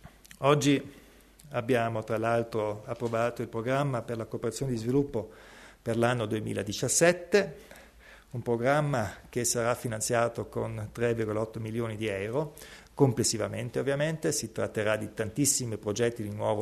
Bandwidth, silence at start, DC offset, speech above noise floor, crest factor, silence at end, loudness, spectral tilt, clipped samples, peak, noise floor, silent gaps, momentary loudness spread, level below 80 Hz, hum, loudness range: 13.5 kHz; 0.05 s; under 0.1%; 25 dB; 20 dB; 0 s; -29 LUFS; -4.5 dB/octave; under 0.1%; -8 dBFS; -55 dBFS; none; 10 LU; -58 dBFS; none; 3 LU